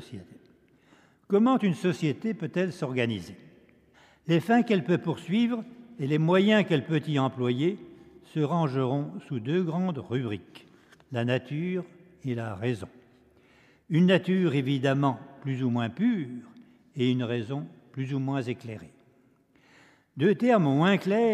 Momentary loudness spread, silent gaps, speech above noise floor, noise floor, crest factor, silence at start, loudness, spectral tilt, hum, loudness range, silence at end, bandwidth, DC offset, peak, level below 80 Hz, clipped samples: 15 LU; none; 37 dB; -63 dBFS; 18 dB; 0 s; -27 LUFS; -7.5 dB/octave; none; 7 LU; 0 s; 12 kHz; under 0.1%; -10 dBFS; -72 dBFS; under 0.1%